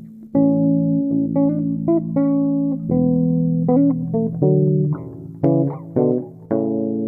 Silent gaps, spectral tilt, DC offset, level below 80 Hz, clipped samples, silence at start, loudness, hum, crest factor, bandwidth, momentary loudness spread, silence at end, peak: none; -14.5 dB/octave; under 0.1%; -52 dBFS; under 0.1%; 0 s; -19 LUFS; none; 14 dB; 2.4 kHz; 6 LU; 0 s; -4 dBFS